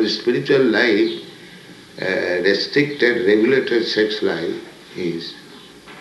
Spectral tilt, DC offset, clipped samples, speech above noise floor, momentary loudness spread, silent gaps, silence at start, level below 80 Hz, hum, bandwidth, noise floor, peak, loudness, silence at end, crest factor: -5 dB/octave; under 0.1%; under 0.1%; 23 dB; 17 LU; none; 0 s; -64 dBFS; none; 12 kHz; -41 dBFS; -2 dBFS; -18 LUFS; 0 s; 16 dB